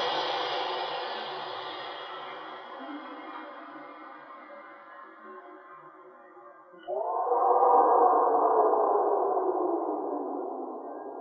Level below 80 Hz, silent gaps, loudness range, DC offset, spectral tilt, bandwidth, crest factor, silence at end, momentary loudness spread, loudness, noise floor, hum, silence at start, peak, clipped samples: under -90 dBFS; none; 21 LU; under 0.1%; -4 dB/octave; 6.2 kHz; 20 dB; 0 s; 25 LU; -27 LUFS; -51 dBFS; none; 0 s; -10 dBFS; under 0.1%